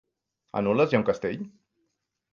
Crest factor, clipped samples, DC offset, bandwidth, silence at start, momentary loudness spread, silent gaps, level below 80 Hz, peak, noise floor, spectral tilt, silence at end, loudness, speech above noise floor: 20 dB; under 0.1%; under 0.1%; 7.2 kHz; 0.55 s; 14 LU; none; -62 dBFS; -8 dBFS; -79 dBFS; -7.5 dB/octave; 0.85 s; -26 LUFS; 54 dB